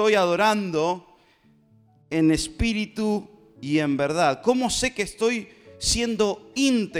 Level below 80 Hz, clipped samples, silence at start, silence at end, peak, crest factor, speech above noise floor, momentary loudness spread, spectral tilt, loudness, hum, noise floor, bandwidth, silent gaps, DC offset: -44 dBFS; under 0.1%; 0 s; 0 s; -6 dBFS; 16 dB; 36 dB; 6 LU; -4 dB/octave; -23 LUFS; none; -59 dBFS; 16 kHz; none; under 0.1%